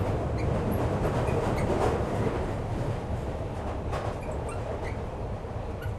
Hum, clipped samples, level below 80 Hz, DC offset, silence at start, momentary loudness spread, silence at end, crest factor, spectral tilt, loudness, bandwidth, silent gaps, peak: none; under 0.1%; -38 dBFS; under 0.1%; 0 s; 8 LU; 0 s; 16 dB; -7.5 dB/octave; -31 LUFS; 13 kHz; none; -12 dBFS